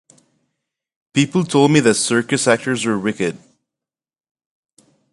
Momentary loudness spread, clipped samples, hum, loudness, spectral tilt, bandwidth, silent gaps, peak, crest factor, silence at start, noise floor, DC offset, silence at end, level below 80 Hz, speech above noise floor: 9 LU; under 0.1%; none; -17 LUFS; -4.5 dB/octave; 11.5 kHz; none; 0 dBFS; 20 dB; 1.15 s; -87 dBFS; under 0.1%; 1.75 s; -60 dBFS; 71 dB